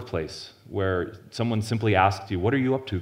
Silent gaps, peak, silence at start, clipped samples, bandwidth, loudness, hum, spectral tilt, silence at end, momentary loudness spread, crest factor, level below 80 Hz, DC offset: none; -4 dBFS; 0 s; under 0.1%; 15 kHz; -26 LUFS; none; -6.5 dB/octave; 0 s; 13 LU; 22 dB; -54 dBFS; under 0.1%